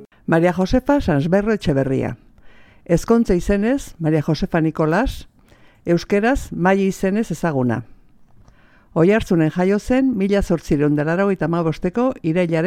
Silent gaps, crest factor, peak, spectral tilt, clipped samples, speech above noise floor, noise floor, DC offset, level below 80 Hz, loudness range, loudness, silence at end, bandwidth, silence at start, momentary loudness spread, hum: none; 18 dB; -2 dBFS; -7 dB/octave; under 0.1%; 32 dB; -50 dBFS; under 0.1%; -36 dBFS; 2 LU; -19 LUFS; 0 s; 15.5 kHz; 0 s; 5 LU; none